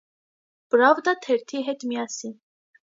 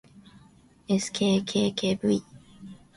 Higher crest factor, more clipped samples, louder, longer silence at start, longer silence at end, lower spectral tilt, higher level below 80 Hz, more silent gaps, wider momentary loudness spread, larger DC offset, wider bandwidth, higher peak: first, 22 dB vs 16 dB; neither; first, -23 LUFS vs -26 LUFS; first, 0.75 s vs 0.15 s; first, 0.65 s vs 0.25 s; second, -2.5 dB/octave vs -5 dB/octave; second, -82 dBFS vs -60 dBFS; neither; second, 14 LU vs 23 LU; neither; second, 7.8 kHz vs 11.5 kHz; first, -4 dBFS vs -12 dBFS